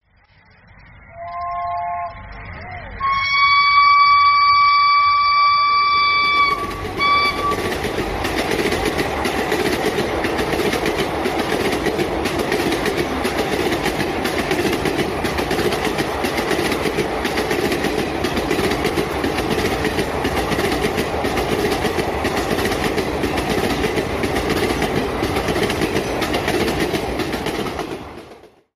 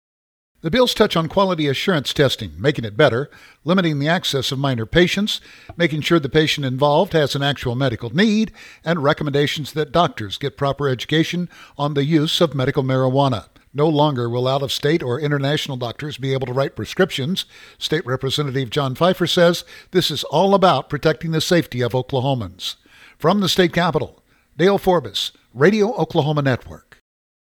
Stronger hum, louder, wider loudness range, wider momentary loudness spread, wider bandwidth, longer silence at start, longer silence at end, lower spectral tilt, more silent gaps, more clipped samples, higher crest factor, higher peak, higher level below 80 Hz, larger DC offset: neither; about the same, -18 LUFS vs -19 LUFS; first, 7 LU vs 3 LU; about the same, 11 LU vs 10 LU; second, 16 kHz vs 19 kHz; first, 0.95 s vs 0.65 s; second, 0.3 s vs 0.7 s; about the same, -4.5 dB/octave vs -5.5 dB/octave; neither; neither; about the same, 16 dB vs 18 dB; second, -4 dBFS vs 0 dBFS; first, -36 dBFS vs -48 dBFS; neither